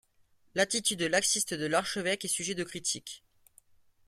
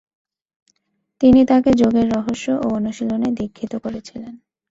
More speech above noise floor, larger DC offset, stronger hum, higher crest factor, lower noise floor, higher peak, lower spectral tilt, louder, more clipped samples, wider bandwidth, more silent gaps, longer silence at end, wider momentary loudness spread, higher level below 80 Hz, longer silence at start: second, 35 dB vs 53 dB; neither; neither; first, 22 dB vs 16 dB; about the same, -67 dBFS vs -70 dBFS; second, -10 dBFS vs -2 dBFS; second, -2 dB/octave vs -7 dB/octave; second, -30 LUFS vs -17 LUFS; neither; first, 16 kHz vs 7.8 kHz; neither; first, 0.9 s vs 0.35 s; second, 10 LU vs 18 LU; second, -70 dBFS vs -46 dBFS; second, 0.55 s vs 1.2 s